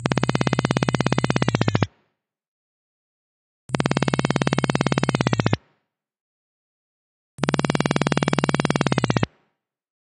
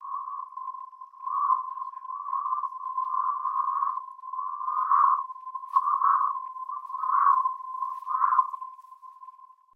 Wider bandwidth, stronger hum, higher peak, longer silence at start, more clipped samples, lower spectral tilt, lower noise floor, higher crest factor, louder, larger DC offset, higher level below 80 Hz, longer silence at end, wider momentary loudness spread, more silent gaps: first, 10.5 kHz vs 2.5 kHz; neither; first, -2 dBFS vs -10 dBFS; about the same, 0 s vs 0 s; neither; first, -5.5 dB/octave vs 0 dB/octave; first, -73 dBFS vs -51 dBFS; about the same, 22 dB vs 18 dB; first, -22 LUFS vs -27 LUFS; neither; first, -48 dBFS vs under -90 dBFS; first, 0.75 s vs 0.3 s; second, 4 LU vs 16 LU; first, 2.48-3.69 s, 6.21-7.38 s vs none